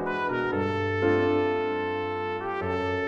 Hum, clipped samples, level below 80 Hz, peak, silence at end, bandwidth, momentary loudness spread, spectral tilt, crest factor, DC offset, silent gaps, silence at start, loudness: none; under 0.1%; -60 dBFS; -12 dBFS; 0 s; 7 kHz; 6 LU; -7.5 dB/octave; 14 dB; under 0.1%; none; 0 s; -27 LUFS